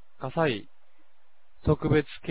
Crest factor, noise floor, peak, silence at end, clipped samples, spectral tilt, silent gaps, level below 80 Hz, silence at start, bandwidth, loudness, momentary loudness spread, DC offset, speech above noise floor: 18 dB; -69 dBFS; -10 dBFS; 0 s; under 0.1%; -11 dB/octave; none; -46 dBFS; 0.2 s; 4 kHz; -28 LUFS; 9 LU; 0.8%; 43 dB